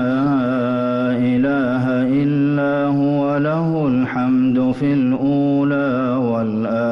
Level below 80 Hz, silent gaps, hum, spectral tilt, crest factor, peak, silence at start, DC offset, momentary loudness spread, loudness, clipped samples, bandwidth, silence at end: -52 dBFS; none; none; -9.5 dB/octave; 8 dB; -10 dBFS; 0 s; under 0.1%; 2 LU; -18 LUFS; under 0.1%; 5.8 kHz; 0 s